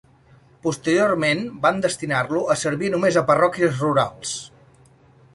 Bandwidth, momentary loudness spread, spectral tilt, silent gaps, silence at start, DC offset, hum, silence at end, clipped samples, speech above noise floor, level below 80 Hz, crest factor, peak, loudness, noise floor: 11.5 kHz; 10 LU; -4.5 dB/octave; none; 0.65 s; under 0.1%; none; 0.9 s; under 0.1%; 32 dB; -58 dBFS; 18 dB; -4 dBFS; -21 LUFS; -53 dBFS